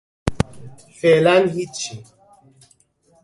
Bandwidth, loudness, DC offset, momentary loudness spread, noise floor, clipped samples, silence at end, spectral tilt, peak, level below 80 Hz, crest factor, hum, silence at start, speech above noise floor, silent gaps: 11.5 kHz; -19 LUFS; under 0.1%; 15 LU; -59 dBFS; under 0.1%; 1.25 s; -5 dB/octave; 0 dBFS; -42 dBFS; 20 dB; none; 0.25 s; 42 dB; none